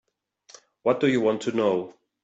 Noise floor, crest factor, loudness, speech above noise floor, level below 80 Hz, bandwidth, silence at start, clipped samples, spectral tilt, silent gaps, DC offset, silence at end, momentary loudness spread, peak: -60 dBFS; 16 dB; -24 LUFS; 36 dB; -72 dBFS; 8 kHz; 0.85 s; under 0.1%; -6 dB/octave; none; under 0.1%; 0.35 s; 8 LU; -10 dBFS